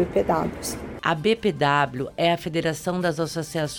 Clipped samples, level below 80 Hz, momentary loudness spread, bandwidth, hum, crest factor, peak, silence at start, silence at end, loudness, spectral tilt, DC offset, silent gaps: under 0.1%; -48 dBFS; 7 LU; 18.5 kHz; none; 18 dB; -6 dBFS; 0 s; 0 s; -24 LUFS; -5 dB/octave; under 0.1%; none